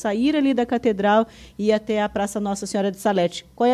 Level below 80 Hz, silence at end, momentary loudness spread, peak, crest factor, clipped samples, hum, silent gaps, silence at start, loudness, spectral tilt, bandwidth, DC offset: -52 dBFS; 0 s; 6 LU; -6 dBFS; 14 dB; under 0.1%; none; none; 0 s; -22 LUFS; -5 dB/octave; 14.5 kHz; under 0.1%